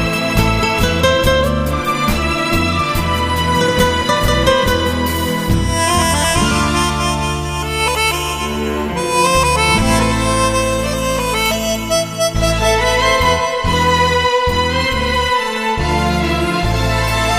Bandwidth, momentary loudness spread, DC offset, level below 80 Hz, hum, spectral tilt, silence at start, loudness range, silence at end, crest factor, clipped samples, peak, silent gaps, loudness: 15.5 kHz; 5 LU; under 0.1%; -24 dBFS; none; -4 dB/octave; 0 s; 1 LU; 0 s; 14 dB; under 0.1%; 0 dBFS; none; -15 LUFS